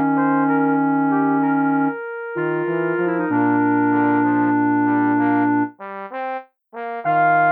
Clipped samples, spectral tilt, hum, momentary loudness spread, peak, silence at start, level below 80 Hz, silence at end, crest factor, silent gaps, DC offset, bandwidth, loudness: under 0.1%; -11.5 dB/octave; none; 11 LU; -6 dBFS; 0 s; -80 dBFS; 0 s; 12 dB; none; under 0.1%; 3.7 kHz; -19 LUFS